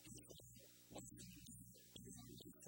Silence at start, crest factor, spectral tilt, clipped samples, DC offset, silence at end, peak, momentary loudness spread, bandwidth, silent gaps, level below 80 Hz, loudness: 0 s; 18 dB; -3.5 dB/octave; under 0.1%; under 0.1%; 0 s; -42 dBFS; 3 LU; 16.5 kHz; none; -74 dBFS; -59 LUFS